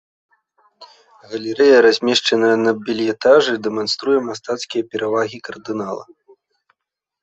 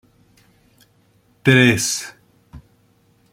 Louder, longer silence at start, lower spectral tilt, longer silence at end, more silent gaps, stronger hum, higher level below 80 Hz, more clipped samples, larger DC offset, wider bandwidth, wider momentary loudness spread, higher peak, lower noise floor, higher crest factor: about the same, -17 LUFS vs -16 LUFS; second, 0.8 s vs 1.45 s; about the same, -3.5 dB/octave vs -4 dB/octave; first, 1.2 s vs 0.75 s; neither; neither; second, -64 dBFS vs -54 dBFS; neither; neither; second, 8.2 kHz vs 16.5 kHz; about the same, 15 LU vs 14 LU; about the same, -2 dBFS vs -2 dBFS; first, -82 dBFS vs -58 dBFS; about the same, 16 dB vs 20 dB